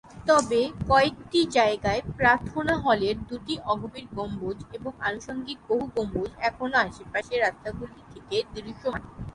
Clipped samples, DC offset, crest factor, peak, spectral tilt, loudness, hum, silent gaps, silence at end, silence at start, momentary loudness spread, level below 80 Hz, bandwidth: under 0.1%; under 0.1%; 22 dB; -4 dBFS; -4.5 dB/octave; -26 LUFS; none; none; 0.05 s; 0.05 s; 13 LU; -48 dBFS; 11.5 kHz